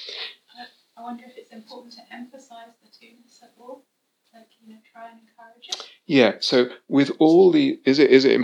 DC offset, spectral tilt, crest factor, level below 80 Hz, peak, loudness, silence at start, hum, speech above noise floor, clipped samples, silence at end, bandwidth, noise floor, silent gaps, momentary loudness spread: under 0.1%; -5.5 dB/octave; 22 dB; under -90 dBFS; 0 dBFS; -18 LUFS; 0 s; none; 24 dB; under 0.1%; 0 s; 9.4 kHz; -46 dBFS; none; 27 LU